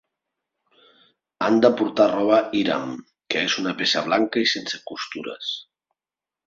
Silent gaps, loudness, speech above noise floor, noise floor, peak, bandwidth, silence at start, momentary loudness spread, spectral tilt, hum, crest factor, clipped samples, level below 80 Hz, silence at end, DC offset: none; -22 LUFS; over 68 dB; under -90 dBFS; -2 dBFS; 7.6 kHz; 1.4 s; 13 LU; -4 dB/octave; none; 22 dB; under 0.1%; -68 dBFS; 0.85 s; under 0.1%